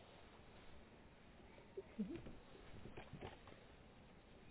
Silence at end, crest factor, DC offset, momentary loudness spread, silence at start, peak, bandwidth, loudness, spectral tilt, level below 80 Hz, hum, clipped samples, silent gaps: 0 s; 22 dB; under 0.1%; 15 LU; 0 s; -36 dBFS; 4 kHz; -58 LUFS; -5.5 dB/octave; -68 dBFS; none; under 0.1%; none